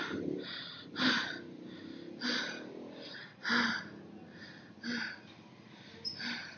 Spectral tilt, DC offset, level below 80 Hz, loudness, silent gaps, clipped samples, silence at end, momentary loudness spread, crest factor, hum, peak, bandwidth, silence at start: -1 dB/octave; under 0.1%; -84 dBFS; -37 LUFS; none; under 0.1%; 0 s; 20 LU; 22 dB; none; -18 dBFS; 6.8 kHz; 0 s